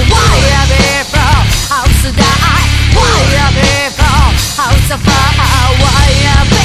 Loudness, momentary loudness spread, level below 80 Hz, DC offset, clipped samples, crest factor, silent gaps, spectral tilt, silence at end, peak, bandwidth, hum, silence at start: -9 LUFS; 3 LU; -12 dBFS; under 0.1%; 0.6%; 8 dB; none; -4 dB/octave; 0 s; 0 dBFS; 15.5 kHz; none; 0 s